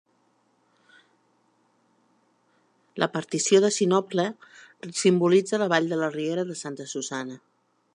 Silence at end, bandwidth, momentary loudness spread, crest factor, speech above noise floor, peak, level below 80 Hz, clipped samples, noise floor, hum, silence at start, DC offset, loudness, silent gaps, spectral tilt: 0.6 s; 11 kHz; 16 LU; 22 dB; 43 dB; -6 dBFS; -80 dBFS; under 0.1%; -67 dBFS; none; 2.95 s; under 0.1%; -24 LUFS; none; -4.5 dB/octave